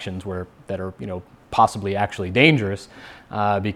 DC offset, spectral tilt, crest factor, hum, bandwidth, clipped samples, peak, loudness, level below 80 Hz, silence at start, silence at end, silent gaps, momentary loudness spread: under 0.1%; -6 dB/octave; 22 dB; none; 13 kHz; under 0.1%; 0 dBFS; -21 LUFS; -52 dBFS; 0 s; 0 s; none; 17 LU